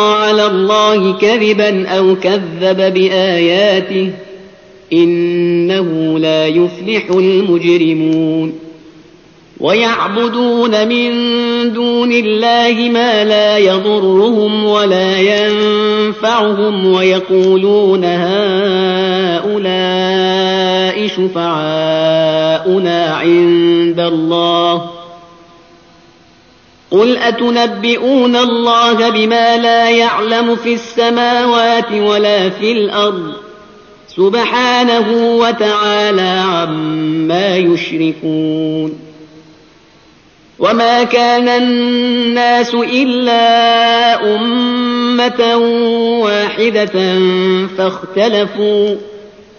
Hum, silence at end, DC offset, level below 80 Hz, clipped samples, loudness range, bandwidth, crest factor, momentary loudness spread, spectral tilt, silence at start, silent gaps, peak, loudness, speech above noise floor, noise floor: none; 0.3 s; under 0.1%; -56 dBFS; under 0.1%; 4 LU; 7 kHz; 12 dB; 5 LU; -3 dB/octave; 0 s; none; 0 dBFS; -11 LUFS; 34 dB; -45 dBFS